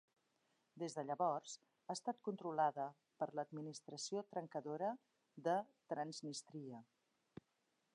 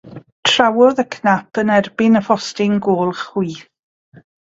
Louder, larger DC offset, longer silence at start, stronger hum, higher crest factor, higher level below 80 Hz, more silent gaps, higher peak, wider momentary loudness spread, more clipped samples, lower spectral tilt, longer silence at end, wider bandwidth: second, -45 LUFS vs -16 LUFS; neither; first, 0.75 s vs 0.05 s; neither; about the same, 20 dB vs 16 dB; second, under -90 dBFS vs -58 dBFS; second, none vs 0.32-0.43 s; second, -26 dBFS vs 0 dBFS; first, 15 LU vs 9 LU; neither; about the same, -4.5 dB/octave vs -5 dB/octave; first, 1.1 s vs 0.9 s; first, 10.5 kHz vs 8 kHz